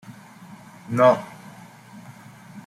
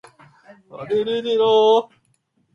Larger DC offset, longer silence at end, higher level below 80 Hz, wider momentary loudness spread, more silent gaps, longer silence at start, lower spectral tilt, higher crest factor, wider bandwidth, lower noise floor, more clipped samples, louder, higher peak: neither; second, 0.05 s vs 0.7 s; about the same, -68 dBFS vs -68 dBFS; first, 27 LU vs 18 LU; neither; second, 0.1 s vs 0.75 s; first, -6.5 dB/octave vs -5 dB/octave; first, 22 dB vs 16 dB; first, 14.5 kHz vs 6.8 kHz; second, -45 dBFS vs -65 dBFS; neither; about the same, -20 LUFS vs -18 LUFS; about the same, -4 dBFS vs -6 dBFS